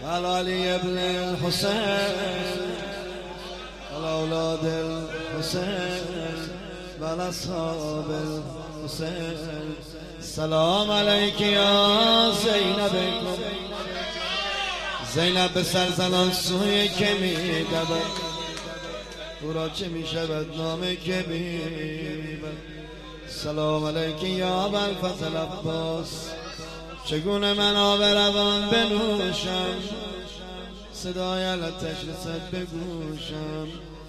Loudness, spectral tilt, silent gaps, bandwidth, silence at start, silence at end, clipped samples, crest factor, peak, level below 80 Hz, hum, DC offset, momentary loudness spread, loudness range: -25 LUFS; -4 dB/octave; none; 15 kHz; 0 s; 0 s; under 0.1%; 20 dB; -6 dBFS; -46 dBFS; none; under 0.1%; 16 LU; 10 LU